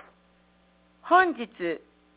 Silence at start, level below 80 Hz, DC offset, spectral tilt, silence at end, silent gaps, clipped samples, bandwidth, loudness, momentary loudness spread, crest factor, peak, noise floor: 1.05 s; -68 dBFS; under 0.1%; -1.5 dB/octave; 0.4 s; none; under 0.1%; 4 kHz; -25 LUFS; 17 LU; 22 dB; -6 dBFS; -62 dBFS